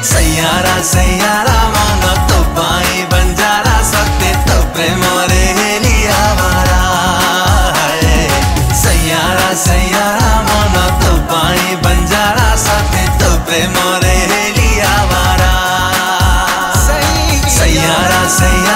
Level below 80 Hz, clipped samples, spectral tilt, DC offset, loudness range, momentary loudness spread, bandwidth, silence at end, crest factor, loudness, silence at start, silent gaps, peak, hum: -16 dBFS; under 0.1%; -3.5 dB/octave; under 0.1%; 1 LU; 2 LU; 16.5 kHz; 0 s; 10 dB; -10 LUFS; 0 s; none; 0 dBFS; none